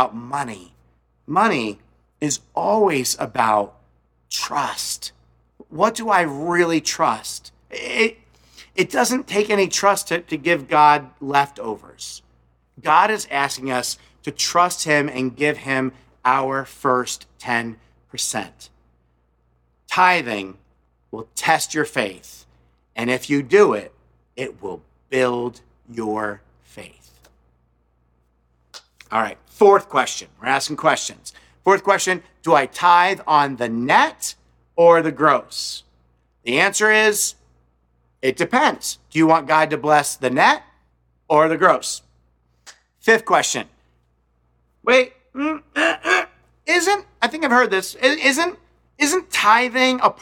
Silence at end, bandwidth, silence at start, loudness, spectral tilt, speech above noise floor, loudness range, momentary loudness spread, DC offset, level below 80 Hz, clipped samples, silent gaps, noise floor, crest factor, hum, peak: 0.1 s; 18 kHz; 0 s; -19 LUFS; -3 dB/octave; 45 dB; 6 LU; 16 LU; under 0.1%; -60 dBFS; under 0.1%; none; -64 dBFS; 20 dB; none; 0 dBFS